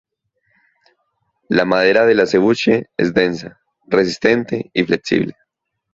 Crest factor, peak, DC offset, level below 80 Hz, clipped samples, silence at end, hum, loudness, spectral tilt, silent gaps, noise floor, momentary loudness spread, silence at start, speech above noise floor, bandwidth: 18 dB; 0 dBFS; under 0.1%; -54 dBFS; under 0.1%; 0.65 s; none; -16 LUFS; -5.5 dB/octave; none; -73 dBFS; 7 LU; 1.5 s; 57 dB; 7.8 kHz